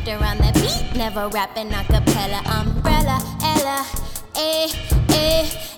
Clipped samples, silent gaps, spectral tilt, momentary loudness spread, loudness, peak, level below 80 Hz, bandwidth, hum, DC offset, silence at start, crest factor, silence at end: under 0.1%; none; -4.5 dB/octave; 7 LU; -20 LUFS; -2 dBFS; -24 dBFS; 18.5 kHz; none; under 0.1%; 0 s; 16 dB; 0 s